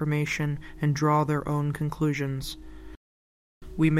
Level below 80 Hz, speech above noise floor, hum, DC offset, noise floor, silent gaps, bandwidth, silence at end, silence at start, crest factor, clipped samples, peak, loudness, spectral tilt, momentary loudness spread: -46 dBFS; over 63 dB; none; under 0.1%; under -90 dBFS; 2.97-3.61 s; 14.5 kHz; 0 s; 0 s; 16 dB; under 0.1%; -12 dBFS; -27 LUFS; -6.5 dB/octave; 15 LU